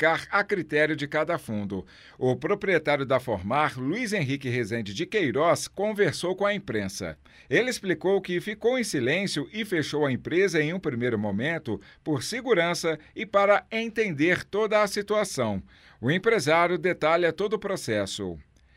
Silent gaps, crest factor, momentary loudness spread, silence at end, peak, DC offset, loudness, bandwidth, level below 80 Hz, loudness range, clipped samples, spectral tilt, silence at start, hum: none; 18 dB; 8 LU; 0.35 s; -8 dBFS; under 0.1%; -26 LUFS; 16 kHz; -60 dBFS; 2 LU; under 0.1%; -5 dB/octave; 0 s; none